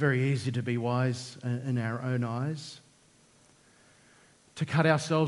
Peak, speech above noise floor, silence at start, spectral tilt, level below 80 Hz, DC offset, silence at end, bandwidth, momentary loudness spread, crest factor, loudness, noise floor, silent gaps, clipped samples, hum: -8 dBFS; 33 dB; 0 s; -6.5 dB/octave; -70 dBFS; under 0.1%; 0 s; 11.5 kHz; 14 LU; 22 dB; -30 LUFS; -62 dBFS; none; under 0.1%; none